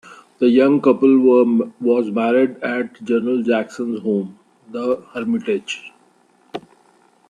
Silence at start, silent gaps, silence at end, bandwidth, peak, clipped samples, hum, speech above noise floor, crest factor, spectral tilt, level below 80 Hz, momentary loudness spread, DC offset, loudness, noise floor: 0.1 s; none; 0.7 s; 9.8 kHz; -2 dBFS; under 0.1%; none; 39 dB; 16 dB; -6.5 dB/octave; -68 dBFS; 17 LU; under 0.1%; -18 LUFS; -56 dBFS